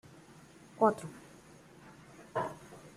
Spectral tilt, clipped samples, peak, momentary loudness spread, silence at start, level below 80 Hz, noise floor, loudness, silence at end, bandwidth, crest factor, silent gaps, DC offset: -6.5 dB/octave; under 0.1%; -12 dBFS; 26 LU; 0.8 s; -72 dBFS; -57 dBFS; -34 LUFS; 0.05 s; 15 kHz; 26 dB; none; under 0.1%